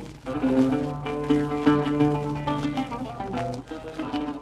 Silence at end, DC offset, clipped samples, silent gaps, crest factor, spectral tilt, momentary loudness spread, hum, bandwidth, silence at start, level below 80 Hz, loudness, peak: 0 s; under 0.1%; under 0.1%; none; 18 dB; -7.5 dB/octave; 11 LU; none; 11 kHz; 0 s; -46 dBFS; -26 LUFS; -8 dBFS